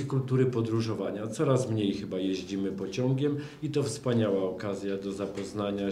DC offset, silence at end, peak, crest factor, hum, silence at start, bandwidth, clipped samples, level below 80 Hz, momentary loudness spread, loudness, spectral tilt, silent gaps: under 0.1%; 0 s; -12 dBFS; 18 dB; none; 0 s; 12.5 kHz; under 0.1%; -62 dBFS; 7 LU; -30 LUFS; -7 dB/octave; none